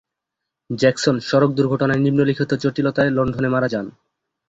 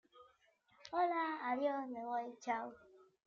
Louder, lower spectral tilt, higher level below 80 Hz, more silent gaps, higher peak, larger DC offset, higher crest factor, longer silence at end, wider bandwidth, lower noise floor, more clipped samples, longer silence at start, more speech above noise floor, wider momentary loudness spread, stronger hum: first, -19 LUFS vs -40 LUFS; first, -6.5 dB/octave vs -4 dB/octave; first, -52 dBFS vs -84 dBFS; neither; first, -2 dBFS vs -26 dBFS; neither; about the same, 18 dB vs 16 dB; first, 0.6 s vs 0.3 s; about the same, 8 kHz vs 7.4 kHz; first, -82 dBFS vs -73 dBFS; neither; first, 0.7 s vs 0.15 s; first, 64 dB vs 34 dB; about the same, 5 LU vs 7 LU; neither